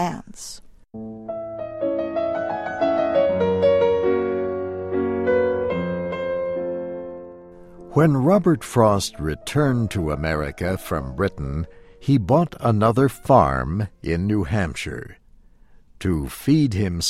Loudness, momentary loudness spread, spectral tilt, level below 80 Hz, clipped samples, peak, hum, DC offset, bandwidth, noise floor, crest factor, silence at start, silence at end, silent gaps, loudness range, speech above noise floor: -22 LUFS; 15 LU; -6.5 dB/octave; -40 dBFS; under 0.1%; -4 dBFS; none; under 0.1%; 16 kHz; -50 dBFS; 18 dB; 0 s; 0 s; none; 4 LU; 30 dB